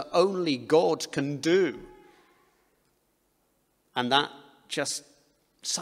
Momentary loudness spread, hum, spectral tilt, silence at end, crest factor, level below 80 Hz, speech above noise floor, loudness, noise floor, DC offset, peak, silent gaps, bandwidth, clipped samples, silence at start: 12 LU; none; -3.5 dB/octave; 0 s; 22 dB; -70 dBFS; 45 dB; -27 LUFS; -71 dBFS; under 0.1%; -6 dBFS; none; 15 kHz; under 0.1%; 0 s